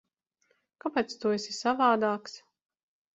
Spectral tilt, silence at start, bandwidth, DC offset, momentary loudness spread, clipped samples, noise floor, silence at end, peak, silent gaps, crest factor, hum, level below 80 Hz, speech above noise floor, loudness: -4 dB/octave; 0.85 s; 8.2 kHz; under 0.1%; 15 LU; under 0.1%; -74 dBFS; 0.75 s; -12 dBFS; none; 20 dB; none; -74 dBFS; 46 dB; -29 LUFS